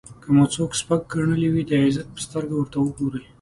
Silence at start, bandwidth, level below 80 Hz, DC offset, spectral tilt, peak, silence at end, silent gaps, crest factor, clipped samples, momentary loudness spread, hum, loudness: 0.1 s; 11.5 kHz; -50 dBFS; under 0.1%; -6 dB/octave; -6 dBFS; 0.2 s; none; 16 dB; under 0.1%; 10 LU; none; -22 LUFS